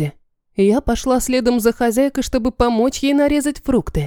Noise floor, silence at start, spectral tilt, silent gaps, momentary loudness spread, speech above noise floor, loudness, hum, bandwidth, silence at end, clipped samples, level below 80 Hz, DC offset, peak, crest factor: -37 dBFS; 0 s; -5.5 dB/octave; none; 4 LU; 21 dB; -17 LUFS; none; 19 kHz; 0 s; under 0.1%; -32 dBFS; under 0.1%; -2 dBFS; 16 dB